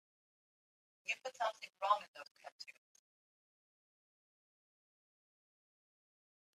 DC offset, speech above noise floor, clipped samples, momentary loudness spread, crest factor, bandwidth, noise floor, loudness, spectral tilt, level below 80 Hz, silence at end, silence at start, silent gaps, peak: under 0.1%; over 48 dB; under 0.1%; 18 LU; 28 dB; 13.5 kHz; under -90 dBFS; -40 LUFS; 0.5 dB/octave; under -90 dBFS; 3.85 s; 1.05 s; 2.08-2.14 s, 2.31-2.35 s, 2.52-2.59 s; -18 dBFS